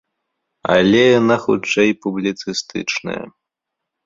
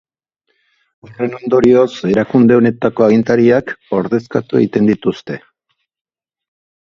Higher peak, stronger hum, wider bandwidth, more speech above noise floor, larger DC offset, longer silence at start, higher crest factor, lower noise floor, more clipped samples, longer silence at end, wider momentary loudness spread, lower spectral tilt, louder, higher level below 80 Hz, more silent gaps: about the same, -2 dBFS vs 0 dBFS; neither; about the same, 7.6 kHz vs 7.2 kHz; first, 65 dB vs 56 dB; neither; second, 0.65 s vs 1.1 s; about the same, 16 dB vs 14 dB; first, -81 dBFS vs -69 dBFS; neither; second, 0.75 s vs 1.5 s; about the same, 13 LU vs 11 LU; second, -5 dB/octave vs -8 dB/octave; second, -16 LUFS vs -13 LUFS; about the same, -52 dBFS vs -50 dBFS; neither